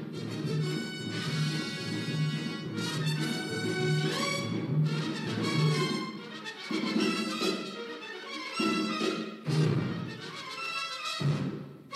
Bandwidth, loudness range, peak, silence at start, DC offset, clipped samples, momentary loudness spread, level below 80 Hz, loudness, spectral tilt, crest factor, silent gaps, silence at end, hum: 13.5 kHz; 2 LU; -16 dBFS; 0 s; under 0.1%; under 0.1%; 10 LU; -76 dBFS; -32 LUFS; -5.5 dB/octave; 16 dB; none; 0 s; none